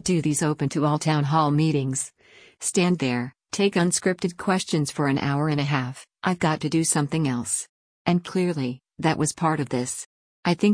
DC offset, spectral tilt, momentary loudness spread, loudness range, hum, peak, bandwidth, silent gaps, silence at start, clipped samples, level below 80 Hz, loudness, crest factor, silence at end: under 0.1%; -5 dB/octave; 8 LU; 2 LU; none; -8 dBFS; 10.5 kHz; 7.69-8.05 s, 10.06-10.43 s; 0.05 s; under 0.1%; -60 dBFS; -24 LUFS; 16 dB; 0 s